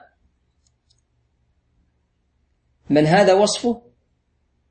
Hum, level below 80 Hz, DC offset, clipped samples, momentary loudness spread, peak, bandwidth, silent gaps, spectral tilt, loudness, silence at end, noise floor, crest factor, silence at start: none; -58 dBFS; under 0.1%; under 0.1%; 11 LU; -2 dBFS; 8.8 kHz; none; -5 dB/octave; -17 LUFS; 0.95 s; -67 dBFS; 20 dB; 2.9 s